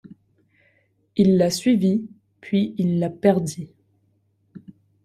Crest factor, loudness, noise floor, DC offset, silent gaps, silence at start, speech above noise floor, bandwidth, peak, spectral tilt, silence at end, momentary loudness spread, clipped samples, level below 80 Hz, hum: 20 dB; -21 LUFS; -65 dBFS; under 0.1%; none; 1.15 s; 46 dB; 13.5 kHz; -4 dBFS; -6.5 dB/octave; 0.45 s; 15 LU; under 0.1%; -60 dBFS; none